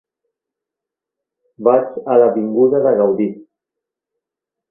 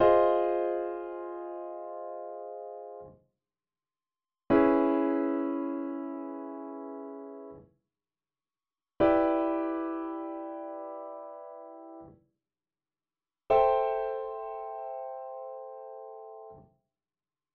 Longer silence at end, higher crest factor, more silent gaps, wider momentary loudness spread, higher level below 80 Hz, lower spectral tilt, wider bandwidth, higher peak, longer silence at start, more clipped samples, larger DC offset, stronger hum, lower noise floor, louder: first, 1.3 s vs 0.95 s; about the same, 18 dB vs 22 dB; neither; second, 6 LU vs 22 LU; about the same, -64 dBFS vs -62 dBFS; first, -12 dB/octave vs -5 dB/octave; second, 3 kHz vs 4.6 kHz; first, 0 dBFS vs -10 dBFS; first, 1.6 s vs 0 s; neither; neither; neither; second, -85 dBFS vs under -90 dBFS; first, -15 LUFS vs -31 LUFS